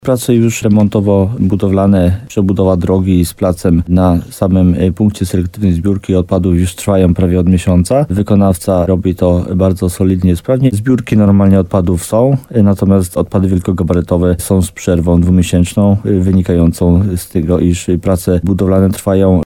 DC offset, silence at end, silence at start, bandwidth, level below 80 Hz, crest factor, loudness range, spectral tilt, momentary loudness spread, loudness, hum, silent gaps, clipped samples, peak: under 0.1%; 0 s; 0.05 s; 16.5 kHz; -30 dBFS; 10 dB; 1 LU; -7.5 dB/octave; 4 LU; -12 LUFS; none; none; under 0.1%; 0 dBFS